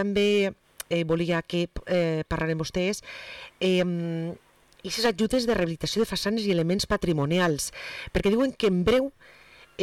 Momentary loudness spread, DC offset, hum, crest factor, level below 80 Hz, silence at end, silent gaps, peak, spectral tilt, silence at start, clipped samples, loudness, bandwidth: 11 LU; under 0.1%; none; 10 dB; -46 dBFS; 0 s; none; -16 dBFS; -5 dB/octave; 0 s; under 0.1%; -26 LUFS; 15.5 kHz